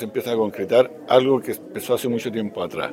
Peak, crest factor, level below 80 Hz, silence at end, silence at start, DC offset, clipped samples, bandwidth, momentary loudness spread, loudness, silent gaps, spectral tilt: -2 dBFS; 20 dB; -66 dBFS; 0 s; 0 s; under 0.1%; under 0.1%; 16.5 kHz; 10 LU; -22 LUFS; none; -5.5 dB/octave